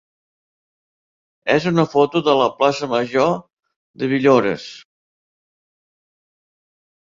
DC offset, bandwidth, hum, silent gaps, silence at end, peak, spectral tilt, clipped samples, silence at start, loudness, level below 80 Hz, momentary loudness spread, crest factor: under 0.1%; 7.6 kHz; none; 3.53-3.57 s, 3.76-3.94 s; 2.2 s; -2 dBFS; -6 dB/octave; under 0.1%; 1.45 s; -18 LUFS; -60 dBFS; 12 LU; 18 dB